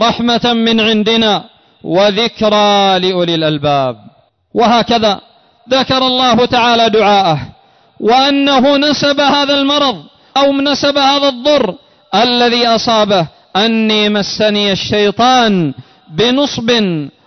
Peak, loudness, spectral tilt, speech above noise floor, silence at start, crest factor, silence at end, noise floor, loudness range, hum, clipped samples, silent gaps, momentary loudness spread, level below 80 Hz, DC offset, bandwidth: -2 dBFS; -11 LUFS; -4.5 dB/octave; 33 dB; 0 s; 10 dB; 0.2 s; -44 dBFS; 2 LU; none; under 0.1%; none; 7 LU; -46 dBFS; under 0.1%; 6.4 kHz